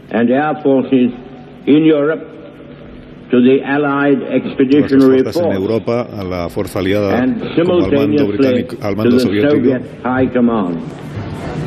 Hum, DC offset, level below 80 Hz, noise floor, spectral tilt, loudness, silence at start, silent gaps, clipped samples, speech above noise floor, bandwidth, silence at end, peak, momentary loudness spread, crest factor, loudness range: none; under 0.1%; -46 dBFS; -34 dBFS; -7.5 dB/octave; -14 LUFS; 0.05 s; none; under 0.1%; 21 dB; 13.5 kHz; 0 s; 0 dBFS; 13 LU; 14 dB; 2 LU